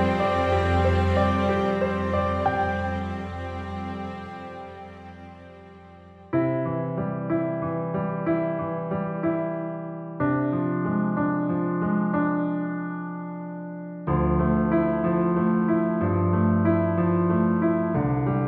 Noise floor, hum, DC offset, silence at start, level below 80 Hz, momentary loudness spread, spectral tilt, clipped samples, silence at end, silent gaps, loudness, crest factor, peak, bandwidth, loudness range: -47 dBFS; none; under 0.1%; 0 s; -42 dBFS; 13 LU; -9 dB/octave; under 0.1%; 0 s; none; -25 LUFS; 16 dB; -8 dBFS; 7.8 kHz; 9 LU